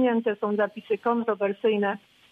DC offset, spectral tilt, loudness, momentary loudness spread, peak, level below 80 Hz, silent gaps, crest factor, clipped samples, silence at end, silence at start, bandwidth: under 0.1%; -8 dB/octave; -26 LUFS; 4 LU; -12 dBFS; -78 dBFS; none; 14 dB; under 0.1%; 0.35 s; 0 s; 4.6 kHz